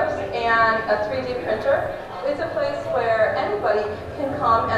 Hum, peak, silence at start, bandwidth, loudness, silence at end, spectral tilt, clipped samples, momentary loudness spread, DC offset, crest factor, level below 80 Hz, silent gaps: none; -6 dBFS; 0 s; 12 kHz; -22 LUFS; 0 s; -6 dB/octave; under 0.1%; 9 LU; under 0.1%; 16 dB; -48 dBFS; none